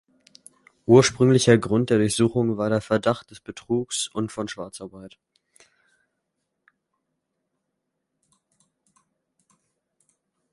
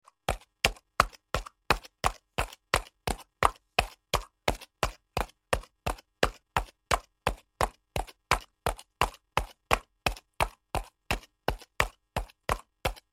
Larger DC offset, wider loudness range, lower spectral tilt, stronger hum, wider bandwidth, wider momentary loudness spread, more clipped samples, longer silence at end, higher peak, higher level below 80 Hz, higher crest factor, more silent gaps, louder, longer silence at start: neither; first, 17 LU vs 2 LU; first, -5.5 dB/octave vs -3 dB/octave; neither; second, 11.5 kHz vs 16.5 kHz; first, 20 LU vs 8 LU; neither; first, 5.45 s vs 0.15 s; about the same, -2 dBFS vs -2 dBFS; second, -58 dBFS vs -42 dBFS; second, 24 dB vs 30 dB; neither; first, -21 LUFS vs -32 LUFS; first, 0.9 s vs 0.3 s